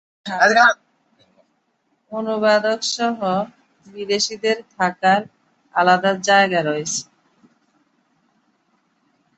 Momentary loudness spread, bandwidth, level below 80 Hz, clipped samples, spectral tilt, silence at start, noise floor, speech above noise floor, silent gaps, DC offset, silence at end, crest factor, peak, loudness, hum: 14 LU; 8.4 kHz; -68 dBFS; under 0.1%; -3 dB/octave; 0.25 s; -67 dBFS; 49 dB; none; under 0.1%; 2.35 s; 20 dB; -2 dBFS; -18 LUFS; none